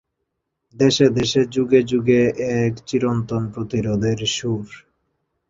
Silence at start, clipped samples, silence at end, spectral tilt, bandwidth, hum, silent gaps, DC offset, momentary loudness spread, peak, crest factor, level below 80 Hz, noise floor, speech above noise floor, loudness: 0.75 s; under 0.1%; 0.7 s; -5.5 dB/octave; 7.8 kHz; none; none; under 0.1%; 9 LU; -2 dBFS; 18 dB; -50 dBFS; -77 dBFS; 58 dB; -19 LUFS